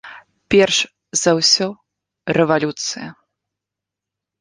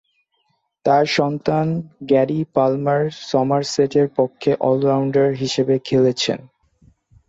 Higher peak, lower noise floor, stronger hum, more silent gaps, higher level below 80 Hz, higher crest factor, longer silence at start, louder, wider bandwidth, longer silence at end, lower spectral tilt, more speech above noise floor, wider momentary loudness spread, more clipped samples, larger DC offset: first, 0 dBFS vs -4 dBFS; first, -85 dBFS vs -68 dBFS; neither; neither; about the same, -56 dBFS vs -58 dBFS; about the same, 20 dB vs 16 dB; second, 0.05 s vs 0.85 s; about the same, -17 LUFS vs -19 LUFS; first, 10.5 kHz vs 8 kHz; first, 1.3 s vs 0.85 s; second, -3 dB/octave vs -6 dB/octave; first, 68 dB vs 50 dB; first, 14 LU vs 5 LU; neither; neither